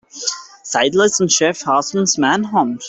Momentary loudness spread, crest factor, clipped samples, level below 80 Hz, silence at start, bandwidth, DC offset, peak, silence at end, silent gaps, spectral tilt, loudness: 9 LU; 14 dB; under 0.1%; -60 dBFS; 0.15 s; 8.4 kHz; under 0.1%; -2 dBFS; 0 s; none; -2.5 dB/octave; -16 LUFS